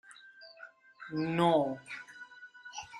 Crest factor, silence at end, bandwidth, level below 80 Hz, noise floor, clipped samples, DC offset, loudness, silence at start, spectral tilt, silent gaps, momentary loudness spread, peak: 22 dB; 0 s; 13 kHz; -76 dBFS; -55 dBFS; under 0.1%; under 0.1%; -32 LUFS; 0.1 s; -6 dB/octave; none; 25 LU; -14 dBFS